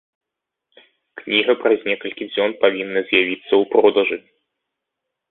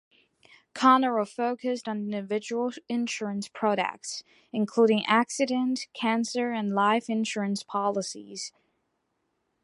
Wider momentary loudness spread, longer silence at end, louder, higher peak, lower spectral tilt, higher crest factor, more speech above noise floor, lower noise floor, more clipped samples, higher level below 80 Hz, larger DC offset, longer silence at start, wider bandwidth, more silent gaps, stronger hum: second, 9 LU vs 13 LU; about the same, 1.1 s vs 1.15 s; first, -18 LUFS vs -27 LUFS; first, -2 dBFS vs -6 dBFS; first, -8.5 dB/octave vs -4.5 dB/octave; about the same, 20 dB vs 22 dB; first, 65 dB vs 50 dB; first, -83 dBFS vs -77 dBFS; neither; first, -66 dBFS vs -78 dBFS; neither; first, 1.15 s vs 0.75 s; second, 4.2 kHz vs 11.5 kHz; neither; neither